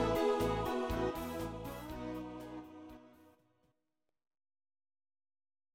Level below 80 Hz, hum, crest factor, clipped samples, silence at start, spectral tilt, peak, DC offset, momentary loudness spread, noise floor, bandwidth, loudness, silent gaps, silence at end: -54 dBFS; none; 18 dB; under 0.1%; 0 s; -6 dB/octave; -22 dBFS; under 0.1%; 20 LU; -89 dBFS; 16.5 kHz; -38 LUFS; none; 2.45 s